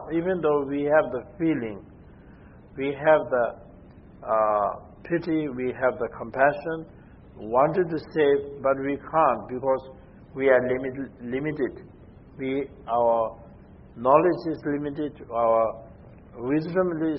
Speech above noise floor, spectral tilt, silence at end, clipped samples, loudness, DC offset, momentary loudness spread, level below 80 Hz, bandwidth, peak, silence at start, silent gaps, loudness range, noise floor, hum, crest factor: 24 dB; -11 dB/octave; 0 s; under 0.1%; -25 LUFS; under 0.1%; 13 LU; -54 dBFS; 5.8 kHz; -4 dBFS; 0 s; none; 3 LU; -48 dBFS; none; 20 dB